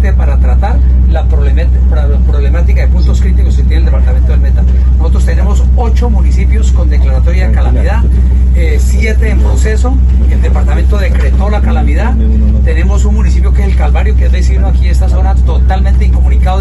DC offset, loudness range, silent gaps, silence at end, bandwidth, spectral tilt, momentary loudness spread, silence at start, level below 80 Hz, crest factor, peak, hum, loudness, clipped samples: under 0.1%; 0 LU; none; 0 s; 8 kHz; -7.5 dB/octave; 1 LU; 0 s; -6 dBFS; 6 dB; 0 dBFS; none; -10 LUFS; under 0.1%